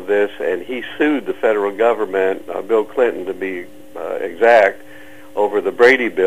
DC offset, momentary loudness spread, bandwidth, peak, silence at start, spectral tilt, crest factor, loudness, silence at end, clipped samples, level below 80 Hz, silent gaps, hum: 1%; 15 LU; 15 kHz; -2 dBFS; 0 s; -5 dB/octave; 16 dB; -17 LUFS; 0 s; under 0.1%; -60 dBFS; none; none